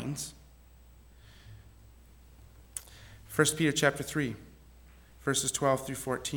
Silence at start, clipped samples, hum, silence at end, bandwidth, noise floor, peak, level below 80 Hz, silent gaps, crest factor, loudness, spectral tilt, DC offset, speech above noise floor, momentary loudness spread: 0 s; under 0.1%; none; 0 s; over 20 kHz; -56 dBFS; -10 dBFS; -56 dBFS; none; 24 dB; -31 LUFS; -3.5 dB/octave; under 0.1%; 26 dB; 23 LU